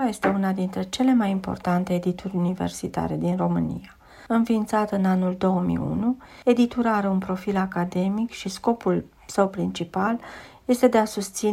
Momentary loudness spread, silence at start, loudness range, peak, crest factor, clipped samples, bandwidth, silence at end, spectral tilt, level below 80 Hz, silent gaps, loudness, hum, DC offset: 7 LU; 0 s; 3 LU; -4 dBFS; 18 dB; under 0.1%; 15 kHz; 0 s; -6.5 dB/octave; -52 dBFS; none; -24 LUFS; none; under 0.1%